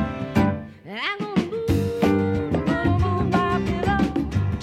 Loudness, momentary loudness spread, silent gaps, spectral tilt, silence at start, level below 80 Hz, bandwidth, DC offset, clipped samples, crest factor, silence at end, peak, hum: -23 LUFS; 5 LU; none; -7.5 dB/octave; 0 s; -36 dBFS; 15 kHz; under 0.1%; under 0.1%; 16 dB; 0 s; -6 dBFS; none